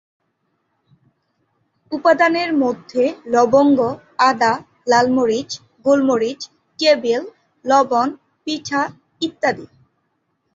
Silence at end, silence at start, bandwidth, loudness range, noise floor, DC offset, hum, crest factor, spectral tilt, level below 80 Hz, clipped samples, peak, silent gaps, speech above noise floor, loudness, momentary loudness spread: 0.9 s; 1.9 s; 7.8 kHz; 4 LU; -69 dBFS; under 0.1%; none; 18 dB; -4 dB/octave; -62 dBFS; under 0.1%; -2 dBFS; none; 53 dB; -17 LUFS; 13 LU